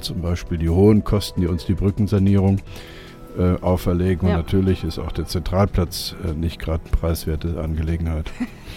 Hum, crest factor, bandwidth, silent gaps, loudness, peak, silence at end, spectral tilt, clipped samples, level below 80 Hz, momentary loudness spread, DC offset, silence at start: none; 16 dB; 16 kHz; none; -21 LUFS; -4 dBFS; 0 s; -7 dB/octave; under 0.1%; -30 dBFS; 10 LU; under 0.1%; 0 s